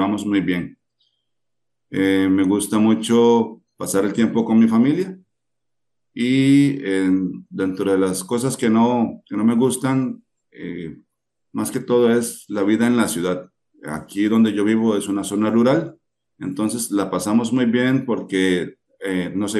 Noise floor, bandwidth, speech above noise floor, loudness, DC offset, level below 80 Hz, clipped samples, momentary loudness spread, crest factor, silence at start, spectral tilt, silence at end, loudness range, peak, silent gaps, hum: -83 dBFS; 12.5 kHz; 65 dB; -19 LUFS; under 0.1%; -64 dBFS; under 0.1%; 15 LU; 14 dB; 0 s; -5.5 dB/octave; 0 s; 3 LU; -4 dBFS; none; none